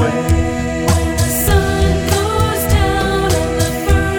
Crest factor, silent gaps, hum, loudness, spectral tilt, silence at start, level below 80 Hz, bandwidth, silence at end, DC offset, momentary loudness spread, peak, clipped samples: 14 dB; none; none; -15 LUFS; -5 dB/octave; 0 s; -20 dBFS; over 20 kHz; 0 s; under 0.1%; 3 LU; -2 dBFS; under 0.1%